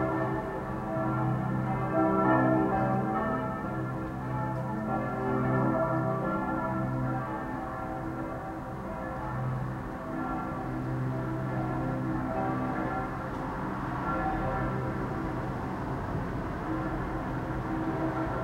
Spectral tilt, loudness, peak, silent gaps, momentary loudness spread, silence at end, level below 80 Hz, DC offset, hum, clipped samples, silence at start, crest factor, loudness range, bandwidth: -9 dB/octave; -31 LUFS; -12 dBFS; none; 8 LU; 0 s; -46 dBFS; under 0.1%; none; under 0.1%; 0 s; 18 dB; 6 LU; 12.5 kHz